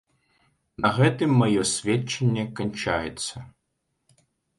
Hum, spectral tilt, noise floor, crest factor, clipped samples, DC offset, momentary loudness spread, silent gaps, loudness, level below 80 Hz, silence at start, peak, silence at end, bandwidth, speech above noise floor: none; -5 dB/octave; -77 dBFS; 20 dB; under 0.1%; under 0.1%; 11 LU; none; -24 LUFS; -54 dBFS; 0.8 s; -6 dBFS; 1.1 s; 11.5 kHz; 53 dB